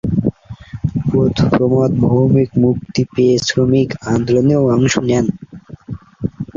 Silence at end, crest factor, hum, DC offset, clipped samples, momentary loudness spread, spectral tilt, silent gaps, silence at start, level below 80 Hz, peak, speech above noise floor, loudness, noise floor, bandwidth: 0.15 s; 12 dB; none; under 0.1%; under 0.1%; 18 LU; -6.5 dB/octave; none; 0.05 s; -38 dBFS; -2 dBFS; 20 dB; -15 LUFS; -34 dBFS; 7.6 kHz